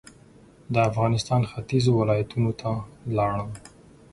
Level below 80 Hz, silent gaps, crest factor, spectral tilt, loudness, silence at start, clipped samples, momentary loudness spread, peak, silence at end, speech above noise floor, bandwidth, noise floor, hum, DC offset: -50 dBFS; none; 18 dB; -7 dB/octave; -25 LUFS; 0.7 s; under 0.1%; 10 LU; -6 dBFS; 0.45 s; 28 dB; 11.5 kHz; -52 dBFS; none; under 0.1%